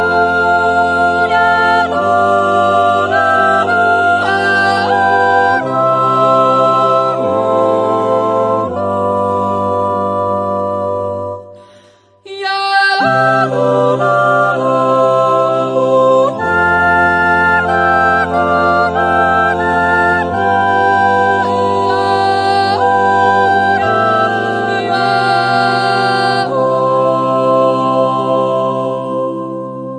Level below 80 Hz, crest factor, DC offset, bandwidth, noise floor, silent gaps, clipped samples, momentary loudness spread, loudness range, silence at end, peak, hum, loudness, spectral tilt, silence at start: -46 dBFS; 12 dB; under 0.1%; 10.5 kHz; -46 dBFS; none; under 0.1%; 5 LU; 4 LU; 0 s; 0 dBFS; none; -12 LUFS; -5.5 dB/octave; 0 s